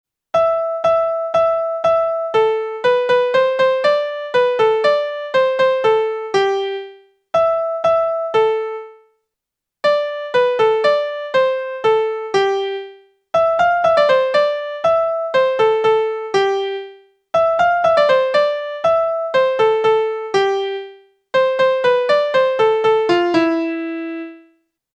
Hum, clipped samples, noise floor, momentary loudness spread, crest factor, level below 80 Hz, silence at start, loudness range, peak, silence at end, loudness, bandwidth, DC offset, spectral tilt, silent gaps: none; under 0.1%; -83 dBFS; 7 LU; 14 dB; -58 dBFS; 0.35 s; 3 LU; -2 dBFS; 0.6 s; -17 LUFS; 9 kHz; under 0.1%; -4.5 dB/octave; none